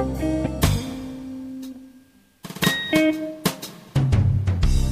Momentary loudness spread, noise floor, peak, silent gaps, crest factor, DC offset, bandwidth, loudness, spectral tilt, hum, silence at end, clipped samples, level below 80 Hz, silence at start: 16 LU; -53 dBFS; -4 dBFS; none; 18 dB; under 0.1%; 15.5 kHz; -23 LUFS; -5.5 dB/octave; none; 0 s; under 0.1%; -30 dBFS; 0 s